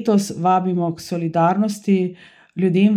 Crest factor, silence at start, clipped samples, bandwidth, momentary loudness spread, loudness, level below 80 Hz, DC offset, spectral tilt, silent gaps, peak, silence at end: 14 dB; 0 s; under 0.1%; 13.5 kHz; 7 LU; -19 LUFS; -66 dBFS; under 0.1%; -7 dB/octave; none; -6 dBFS; 0 s